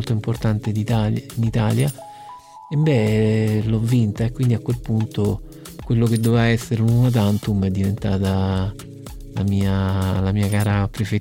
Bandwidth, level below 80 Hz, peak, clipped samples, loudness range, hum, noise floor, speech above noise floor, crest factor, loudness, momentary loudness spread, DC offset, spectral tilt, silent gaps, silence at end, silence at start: 16.5 kHz; -40 dBFS; -6 dBFS; under 0.1%; 2 LU; none; -40 dBFS; 21 dB; 14 dB; -20 LUFS; 13 LU; 0.1%; -7.5 dB/octave; none; 0 s; 0 s